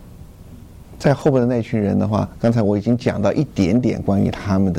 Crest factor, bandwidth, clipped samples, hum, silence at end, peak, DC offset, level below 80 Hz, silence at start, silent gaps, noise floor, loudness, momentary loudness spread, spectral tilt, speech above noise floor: 14 dB; 11.5 kHz; under 0.1%; none; 0 s; -4 dBFS; under 0.1%; -42 dBFS; 0.05 s; none; -39 dBFS; -18 LUFS; 3 LU; -8 dB/octave; 22 dB